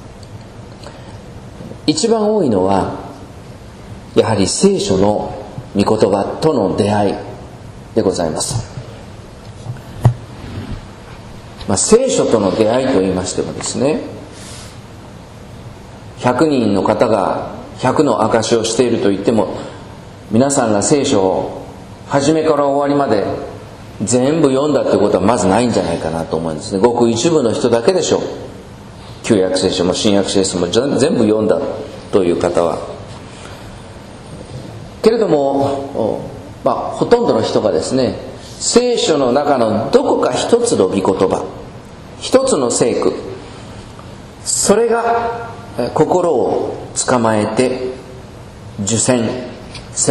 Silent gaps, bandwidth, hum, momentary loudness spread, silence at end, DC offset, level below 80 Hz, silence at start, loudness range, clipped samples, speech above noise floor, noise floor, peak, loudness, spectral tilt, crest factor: none; 13 kHz; none; 21 LU; 0 s; under 0.1%; -42 dBFS; 0 s; 5 LU; under 0.1%; 20 dB; -34 dBFS; 0 dBFS; -15 LUFS; -5 dB/octave; 16 dB